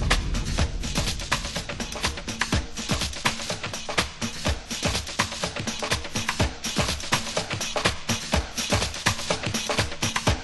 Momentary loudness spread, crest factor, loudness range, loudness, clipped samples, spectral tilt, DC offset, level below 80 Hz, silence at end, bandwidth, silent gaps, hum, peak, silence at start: 4 LU; 20 dB; 2 LU; -26 LUFS; under 0.1%; -3 dB/octave; under 0.1%; -34 dBFS; 0 s; 12.5 kHz; none; none; -6 dBFS; 0 s